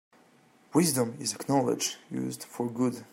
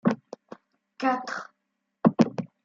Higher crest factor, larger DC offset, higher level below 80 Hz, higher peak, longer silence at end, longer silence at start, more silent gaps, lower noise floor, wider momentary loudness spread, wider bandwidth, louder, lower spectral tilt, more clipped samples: about the same, 20 dB vs 24 dB; neither; about the same, -74 dBFS vs -72 dBFS; second, -10 dBFS vs -4 dBFS; about the same, 0.1 s vs 0.2 s; first, 0.7 s vs 0.05 s; neither; second, -61 dBFS vs -80 dBFS; second, 9 LU vs 23 LU; first, 16.5 kHz vs 7.6 kHz; about the same, -29 LUFS vs -27 LUFS; second, -4.5 dB/octave vs -7 dB/octave; neither